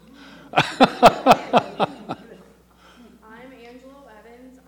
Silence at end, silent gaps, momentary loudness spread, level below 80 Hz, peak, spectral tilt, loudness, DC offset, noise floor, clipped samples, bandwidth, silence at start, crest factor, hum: 2.55 s; none; 21 LU; -52 dBFS; 0 dBFS; -5 dB/octave; -18 LUFS; under 0.1%; -52 dBFS; under 0.1%; over 20 kHz; 0.55 s; 22 dB; none